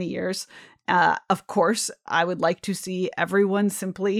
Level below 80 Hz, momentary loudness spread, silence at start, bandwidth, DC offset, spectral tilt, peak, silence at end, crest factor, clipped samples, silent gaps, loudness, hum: -70 dBFS; 8 LU; 0 s; 15.5 kHz; under 0.1%; -4.5 dB/octave; -6 dBFS; 0 s; 18 dB; under 0.1%; none; -24 LUFS; none